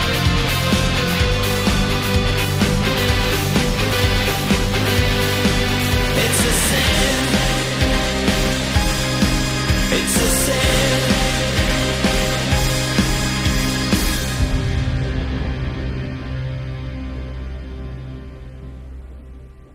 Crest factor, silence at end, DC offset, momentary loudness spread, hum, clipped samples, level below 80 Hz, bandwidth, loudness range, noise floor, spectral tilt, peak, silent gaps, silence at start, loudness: 14 dB; 0.1 s; under 0.1%; 14 LU; none; under 0.1%; -26 dBFS; 16 kHz; 10 LU; -38 dBFS; -4 dB/octave; -4 dBFS; none; 0 s; -18 LUFS